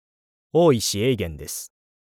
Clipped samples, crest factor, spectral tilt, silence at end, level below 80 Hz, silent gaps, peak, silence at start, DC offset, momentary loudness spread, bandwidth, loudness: under 0.1%; 18 dB; -5 dB/octave; 0.5 s; -48 dBFS; none; -6 dBFS; 0.55 s; under 0.1%; 15 LU; 19 kHz; -21 LUFS